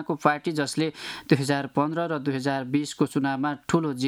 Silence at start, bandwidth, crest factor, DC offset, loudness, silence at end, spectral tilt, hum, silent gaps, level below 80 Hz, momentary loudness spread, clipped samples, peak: 0 s; 14.5 kHz; 22 dB; under 0.1%; -26 LUFS; 0 s; -5.5 dB/octave; none; none; -64 dBFS; 4 LU; under 0.1%; -4 dBFS